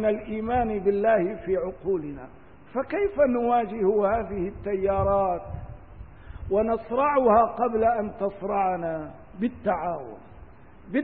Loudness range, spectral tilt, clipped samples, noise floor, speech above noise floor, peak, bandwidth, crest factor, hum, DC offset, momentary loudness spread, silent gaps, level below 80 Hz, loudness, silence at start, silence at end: 3 LU; -11.5 dB/octave; under 0.1%; -48 dBFS; 24 dB; -8 dBFS; 4.3 kHz; 18 dB; none; 0.3%; 17 LU; none; -46 dBFS; -25 LUFS; 0 s; 0 s